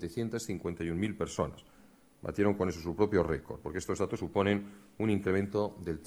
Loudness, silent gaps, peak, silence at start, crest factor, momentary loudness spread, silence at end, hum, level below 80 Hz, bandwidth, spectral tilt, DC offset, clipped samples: -33 LUFS; none; -14 dBFS; 0 s; 18 dB; 8 LU; 0 s; none; -54 dBFS; over 20 kHz; -6.5 dB/octave; under 0.1%; under 0.1%